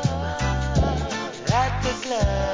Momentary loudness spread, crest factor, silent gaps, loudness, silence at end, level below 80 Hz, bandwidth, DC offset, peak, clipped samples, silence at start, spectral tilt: 4 LU; 14 dB; none; -24 LUFS; 0 s; -30 dBFS; 7.6 kHz; 0.1%; -8 dBFS; under 0.1%; 0 s; -5.5 dB/octave